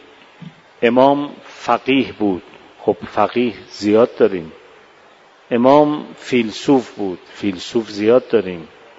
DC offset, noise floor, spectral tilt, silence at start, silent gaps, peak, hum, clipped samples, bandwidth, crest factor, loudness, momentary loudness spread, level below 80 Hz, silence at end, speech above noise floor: under 0.1%; -47 dBFS; -6 dB/octave; 0.4 s; none; 0 dBFS; none; under 0.1%; 8 kHz; 18 dB; -17 LUFS; 13 LU; -58 dBFS; 0.3 s; 31 dB